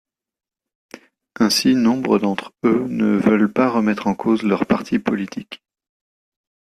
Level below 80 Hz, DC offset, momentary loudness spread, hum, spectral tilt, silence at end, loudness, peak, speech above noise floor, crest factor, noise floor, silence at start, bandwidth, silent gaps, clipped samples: -58 dBFS; under 0.1%; 8 LU; none; -5 dB/octave; 1.05 s; -18 LUFS; -4 dBFS; 23 dB; 16 dB; -41 dBFS; 1.4 s; 14 kHz; none; under 0.1%